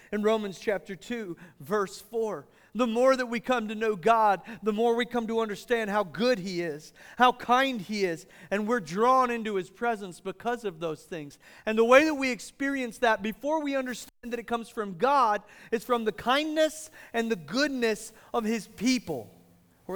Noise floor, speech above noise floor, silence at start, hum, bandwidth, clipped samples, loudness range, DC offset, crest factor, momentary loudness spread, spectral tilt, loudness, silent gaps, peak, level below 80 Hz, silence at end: -60 dBFS; 32 dB; 0.1 s; none; over 20 kHz; under 0.1%; 3 LU; under 0.1%; 22 dB; 13 LU; -4.5 dB/octave; -28 LUFS; none; -6 dBFS; -62 dBFS; 0 s